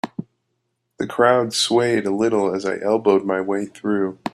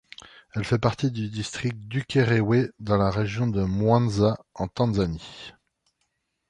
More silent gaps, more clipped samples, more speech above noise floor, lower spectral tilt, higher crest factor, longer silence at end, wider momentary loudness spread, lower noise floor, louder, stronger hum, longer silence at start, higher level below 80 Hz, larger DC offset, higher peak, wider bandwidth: neither; neither; about the same, 54 dB vs 52 dB; second, -4.5 dB/octave vs -7 dB/octave; about the same, 18 dB vs 20 dB; second, 0.05 s vs 1 s; second, 10 LU vs 15 LU; about the same, -73 dBFS vs -76 dBFS; first, -19 LUFS vs -25 LUFS; neither; second, 0.05 s vs 0.55 s; second, -62 dBFS vs -46 dBFS; neither; first, -2 dBFS vs -6 dBFS; first, 13 kHz vs 10.5 kHz